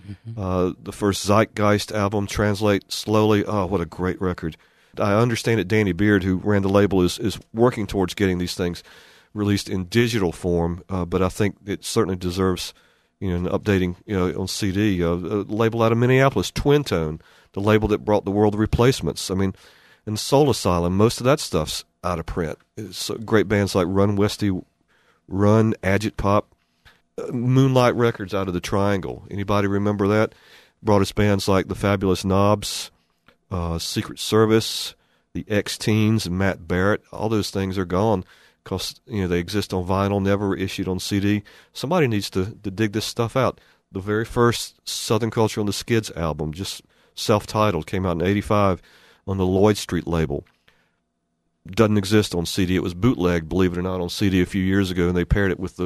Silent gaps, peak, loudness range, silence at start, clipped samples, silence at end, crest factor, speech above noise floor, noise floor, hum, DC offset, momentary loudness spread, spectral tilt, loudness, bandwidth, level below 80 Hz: none; -2 dBFS; 3 LU; 0.05 s; under 0.1%; 0 s; 18 dB; 52 dB; -73 dBFS; none; under 0.1%; 10 LU; -6 dB/octave; -22 LUFS; 13.5 kHz; -42 dBFS